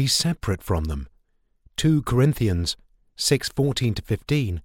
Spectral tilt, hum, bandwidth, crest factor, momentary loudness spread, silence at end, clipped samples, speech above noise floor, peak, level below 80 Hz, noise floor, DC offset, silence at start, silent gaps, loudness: -5 dB/octave; none; 17.5 kHz; 18 dB; 11 LU; 0.05 s; under 0.1%; 42 dB; -6 dBFS; -38 dBFS; -64 dBFS; under 0.1%; 0 s; none; -23 LUFS